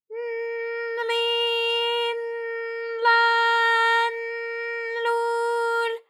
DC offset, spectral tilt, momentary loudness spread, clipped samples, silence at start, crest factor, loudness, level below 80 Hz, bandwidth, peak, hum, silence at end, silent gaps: under 0.1%; 3.5 dB/octave; 11 LU; under 0.1%; 0.1 s; 16 dB; -23 LUFS; under -90 dBFS; 13.5 kHz; -8 dBFS; none; 0.1 s; none